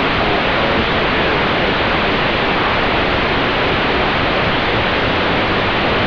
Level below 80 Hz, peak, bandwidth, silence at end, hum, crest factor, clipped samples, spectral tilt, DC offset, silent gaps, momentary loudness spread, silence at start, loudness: -30 dBFS; -4 dBFS; 5.4 kHz; 0 s; none; 10 dB; under 0.1%; -6 dB/octave; under 0.1%; none; 0 LU; 0 s; -15 LUFS